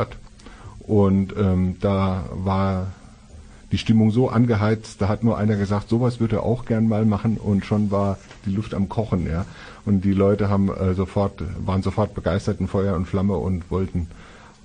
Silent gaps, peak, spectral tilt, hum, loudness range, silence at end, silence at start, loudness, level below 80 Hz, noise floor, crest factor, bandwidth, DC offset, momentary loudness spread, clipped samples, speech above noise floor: none; -6 dBFS; -8.5 dB/octave; none; 3 LU; 0.3 s; 0 s; -22 LUFS; -42 dBFS; -44 dBFS; 16 dB; 9.8 kHz; under 0.1%; 9 LU; under 0.1%; 23 dB